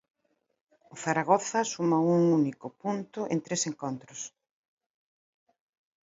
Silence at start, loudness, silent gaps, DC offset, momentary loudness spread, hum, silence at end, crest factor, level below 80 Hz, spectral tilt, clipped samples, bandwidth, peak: 0.95 s; -28 LUFS; none; under 0.1%; 14 LU; none; 1.75 s; 22 dB; -76 dBFS; -5 dB/octave; under 0.1%; 8 kHz; -8 dBFS